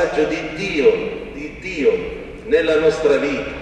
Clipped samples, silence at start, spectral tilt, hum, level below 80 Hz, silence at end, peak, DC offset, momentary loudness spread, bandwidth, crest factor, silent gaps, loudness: under 0.1%; 0 s; -5 dB/octave; none; -42 dBFS; 0 s; -4 dBFS; under 0.1%; 13 LU; 9.2 kHz; 16 dB; none; -18 LUFS